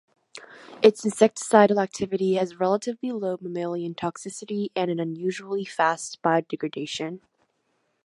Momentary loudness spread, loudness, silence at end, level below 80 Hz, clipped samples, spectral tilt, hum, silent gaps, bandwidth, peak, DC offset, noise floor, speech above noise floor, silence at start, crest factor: 13 LU; -25 LUFS; 0.85 s; -70 dBFS; under 0.1%; -5 dB/octave; none; none; 11.5 kHz; -2 dBFS; under 0.1%; -72 dBFS; 48 dB; 0.35 s; 22 dB